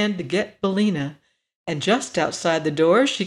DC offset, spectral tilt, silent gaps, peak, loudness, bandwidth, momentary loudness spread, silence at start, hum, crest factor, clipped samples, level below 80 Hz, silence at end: under 0.1%; -4.5 dB/octave; 1.56-1.65 s; -6 dBFS; -22 LUFS; 12 kHz; 12 LU; 0 s; none; 14 dB; under 0.1%; -62 dBFS; 0 s